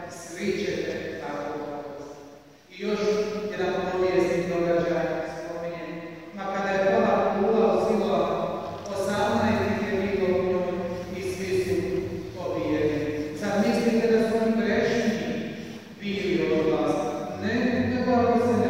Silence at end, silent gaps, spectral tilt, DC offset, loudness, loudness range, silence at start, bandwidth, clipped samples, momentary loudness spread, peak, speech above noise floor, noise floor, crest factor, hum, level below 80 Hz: 0 s; none; -6 dB/octave; 0.2%; -26 LUFS; 4 LU; 0 s; 16 kHz; under 0.1%; 12 LU; -10 dBFS; 22 dB; -48 dBFS; 16 dB; none; -54 dBFS